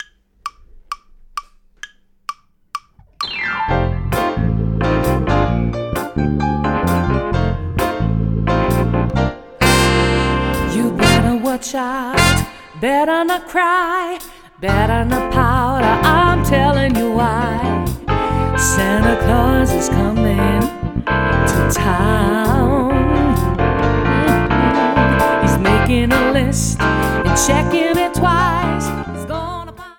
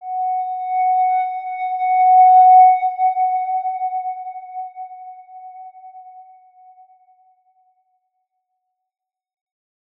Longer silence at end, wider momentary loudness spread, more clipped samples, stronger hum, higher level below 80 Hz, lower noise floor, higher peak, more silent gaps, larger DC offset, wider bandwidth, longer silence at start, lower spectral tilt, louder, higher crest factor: second, 0.05 s vs 3.8 s; second, 11 LU vs 25 LU; neither; neither; first, -26 dBFS vs under -90 dBFS; second, -39 dBFS vs -76 dBFS; first, 0 dBFS vs -4 dBFS; neither; neither; first, 19 kHz vs 3.9 kHz; about the same, 0 s vs 0 s; first, -5.5 dB/octave vs -2 dB/octave; about the same, -16 LUFS vs -15 LUFS; about the same, 16 dB vs 16 dB